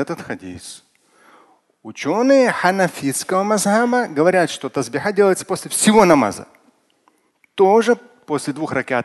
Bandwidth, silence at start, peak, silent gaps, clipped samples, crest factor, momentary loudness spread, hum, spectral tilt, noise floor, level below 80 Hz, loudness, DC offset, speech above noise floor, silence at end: 12.5 kHz; 0 s; 0 dBFS; none; under 0.1%; 18 dB; 17 LU; none; -4.5 dB/octave; -60 dBFS; -58 dBFS; -17 LUFS; under 0.1%; 44 dB; 0 s